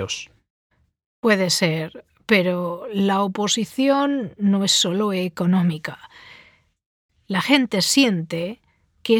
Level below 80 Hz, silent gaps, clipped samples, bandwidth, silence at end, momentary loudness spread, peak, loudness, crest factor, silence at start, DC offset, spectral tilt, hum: -64 dBFS; 0.50-0.70 s, 1.06-1.23 s, 6.86-7.09 s; under 0.1%; 18 kHz; 0 s; 14 LU; -2 dBFS; -20 LUFS; 18 dB; 0 s; under 0.1%; -4 dB/octave; none